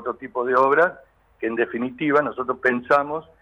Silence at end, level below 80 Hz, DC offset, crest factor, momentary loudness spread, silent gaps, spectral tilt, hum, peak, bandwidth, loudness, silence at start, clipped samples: 0.2 s; -62 dBFS; under 0.1%; 16 dB; 10 LU; none; -7 dB/octave; none; -6 dBFS; 9 kHz; -21 LUFS; 0 s; under 0.1%